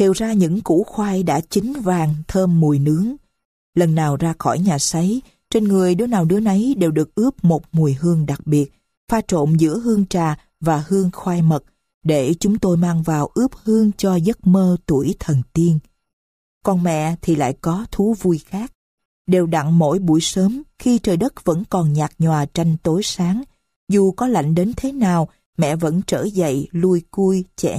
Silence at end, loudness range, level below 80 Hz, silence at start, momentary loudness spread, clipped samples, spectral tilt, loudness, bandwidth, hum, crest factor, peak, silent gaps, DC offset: 0 s; 2 LU; -44 dBFS; 0 s; 6 LU; under 0.1%; -6.5 dB/octave; -18 LUFS; 15.5 kHz; none; 14 dB; -4 dBFS; 3.45-3.73 s, 8.97-9.07 s, 11.94-12.01 s, 16.13-16.61 s, 18.75-18.98 s, 19.05-19.25 s, 23.76-23.87 s, 25.46-25.53 s; under 0.1%